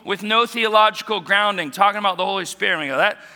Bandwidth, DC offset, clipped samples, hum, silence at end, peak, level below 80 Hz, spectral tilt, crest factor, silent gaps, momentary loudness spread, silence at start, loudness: 19.5 kHz; under 0.1%; under 0.1%; none; 0.1 s; 0 dBFS; -74 dBFS; -2.5 dB/octave; 20 dB; none; 6 LU; 0.05 s; -18 LUFS